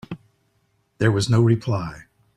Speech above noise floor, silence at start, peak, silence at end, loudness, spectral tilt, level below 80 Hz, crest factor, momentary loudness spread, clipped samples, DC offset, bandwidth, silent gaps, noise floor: 48 dB; 0.1 s; -4 dBFS; 0.35 s; -20 LUFS; -6.5 dB/octave; -52 dBFS; 20 dB; 19 LU; under 0.1%; under 0.1%; 10.5 kHz; none; -67 dBFS